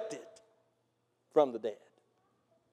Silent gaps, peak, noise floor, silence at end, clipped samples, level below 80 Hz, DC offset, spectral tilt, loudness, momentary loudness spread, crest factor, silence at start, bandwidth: none; -14 dBFS; -78 dBFS; 1 s; under 0.1%; under -90 dBFS; under 0.1%; -5 dB/octave; -33 LUFS; 18 LU; 24 dB; 0 s; 10 kHz